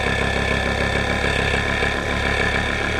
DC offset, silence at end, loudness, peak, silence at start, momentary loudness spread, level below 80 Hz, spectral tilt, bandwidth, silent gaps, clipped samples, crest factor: under 0.1%; 0 s; -20 LUFS; -6 dBFS; 0 s; 1 LU; -28 dBFS; -4.5 dB/octave; 13.5 kHz; none; under 0.1%; 14 dB